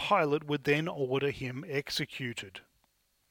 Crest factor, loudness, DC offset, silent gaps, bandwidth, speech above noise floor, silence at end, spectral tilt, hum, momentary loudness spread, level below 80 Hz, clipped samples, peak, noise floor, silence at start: 20 dB; -32 LUFS; under 0.1%; none; 18.5 kHz; 42 dB; 0.7 s; -5 dB/octave; none; 12 LU; -66 dBFS; under 0.1%; -12 dBFS; -73 dBFS; 0 s